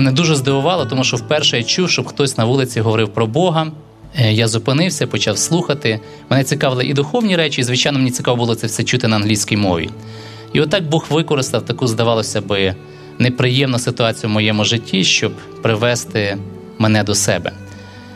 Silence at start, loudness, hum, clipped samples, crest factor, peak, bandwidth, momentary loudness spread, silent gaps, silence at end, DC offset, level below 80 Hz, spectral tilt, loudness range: 0 s; -16 LUFS; none; under 0.1%; 16 dB; 0 dBFS; 14.5 kHz; 7 LU; none; 0 s; under 0.1%; -50 dBFS; -4.5 dB/octave; 2 LU